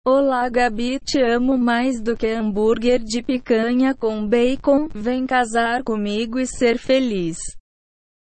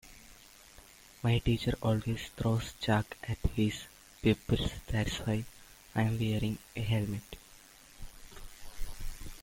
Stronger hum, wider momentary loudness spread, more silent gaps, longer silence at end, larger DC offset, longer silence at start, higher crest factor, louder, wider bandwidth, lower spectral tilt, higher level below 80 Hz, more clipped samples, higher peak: neither; second, 6 LU vs 23 LU; neither; first, 0.65 s vs 0 s; neither; about the same, 0.05 s vs 0.05 s; second, 14 dB vs 20 dB; first, -20 LUFS vs -33 LUFS; second, 8.8 kHz vs 16.5 kHz; second, -4.5 dB/octave vs -6 dB/octave; about the same, -42 dBFS vs -46 dBFS; neither; first, -4 dBFS vs -14 dBFS